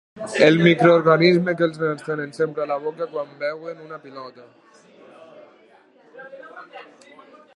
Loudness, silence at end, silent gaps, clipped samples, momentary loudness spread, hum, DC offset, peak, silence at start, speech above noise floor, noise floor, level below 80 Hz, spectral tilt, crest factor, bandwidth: -19 LUFS; 0.75 s; none; under 0.1%; 26 LU; none; under 0.1%; 0 dBFS; 0.15 s; 34 dB; -53 dBFS; -70 dBFS; -6.5 dB/octave; 22 dB; 11 kHz